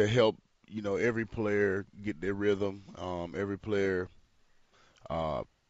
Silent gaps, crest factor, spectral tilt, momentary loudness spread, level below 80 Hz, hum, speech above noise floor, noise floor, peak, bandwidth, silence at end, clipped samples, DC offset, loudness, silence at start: none; 18 dB; -5 dB/octave; 10 LU; -58 dBFS; none; 34 dB; -65 dBFS; -14 dBFS; 8 kHz; 0.25 s; under 0.1%; under 0.1%; -32 LUFS; 0 s